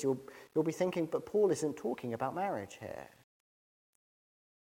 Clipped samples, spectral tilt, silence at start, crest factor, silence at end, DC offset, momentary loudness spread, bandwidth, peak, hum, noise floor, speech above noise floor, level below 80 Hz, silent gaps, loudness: under 0.1%; -6 dB/octave; 0 s; 18 dB; 1.7 s; under 0.1%; 14 LU; 16.5 kHz; -18 dBFS; none; under -90 dBFS; over 55 dB; -76 dBFS; none; -35 LUFS